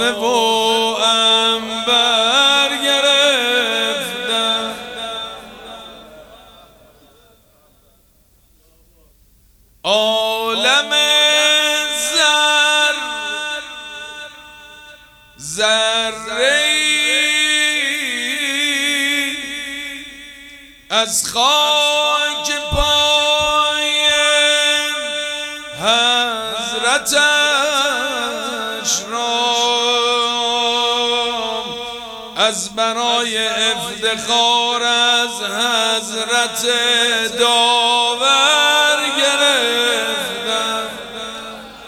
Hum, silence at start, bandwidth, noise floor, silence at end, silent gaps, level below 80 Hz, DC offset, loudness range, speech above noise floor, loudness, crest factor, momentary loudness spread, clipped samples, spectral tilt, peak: none; 0 s; over 20 kHz; -54 dBFS; 0 s; none; -44 dBFS; under 0.1%; 6 LU; 38 dB; -14 LUFS; 16 dB; 14 LU; under 0.1%; 0 dB/octave; 0 dBFS